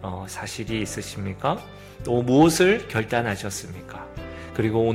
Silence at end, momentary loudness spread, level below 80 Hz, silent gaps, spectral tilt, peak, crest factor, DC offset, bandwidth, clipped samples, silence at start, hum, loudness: 0 s; 20 LU; -46 dBFS; none; -5 dB/octave; -4 dBFS; 20 dB; under 0.1%; 16 kHz; under 0.1%; 0 s; none; -24 LUFS